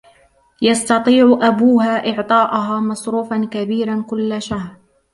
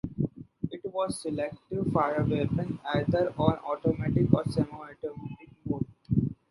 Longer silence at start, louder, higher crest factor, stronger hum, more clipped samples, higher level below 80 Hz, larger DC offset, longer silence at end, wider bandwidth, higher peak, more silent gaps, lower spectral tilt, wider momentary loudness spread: first, 0.6 s vs 0.05 s; first, -16 LUFS vs -30 LUFS; second, 14 dB vs 24 dB; neither; neither; about the same, -54 dBFS vs -50 dBFS; neither; first, 0.4 s vs 0.15 s; about the same, 11.5 kHz vs 11.5 kHz; first, -2 dBFS vs -6 dBFS; neither; second, -5 dB/octave vs -7.5 dB/octave; second, 10 LU vs 13 LU